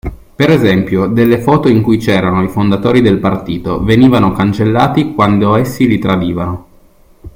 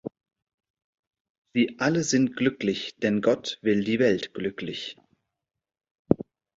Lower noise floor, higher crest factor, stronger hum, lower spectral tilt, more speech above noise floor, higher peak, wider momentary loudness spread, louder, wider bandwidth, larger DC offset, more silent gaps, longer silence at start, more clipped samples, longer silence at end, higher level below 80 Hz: second, -44 dBFS vs -85 dBFS; second, 10 dB vs 26 dB; neither; first, -7.5 dB/octave vs -5 dB/octave; second, 33 dB vs 60 dB; about the same, 0 dBFS vs -2 dBFS; about the same, 8 LU vs 10 LU; first, -11 LUFS vs -26 LUFS; first, 16.5 kHz vs 7.8 kHz; neither; second, none vs 0.42-0.47 s, 0.54-0.58 s, 0.70-0.74 s, 0.84-1.11 s, 1.20-1.45 s, 5.91-6.05 s; about the same, 0.05 s vs 0.05 s; neither; second, 0.05 s vs 0.35 s; first, -34 dBFS vs -60 dBFS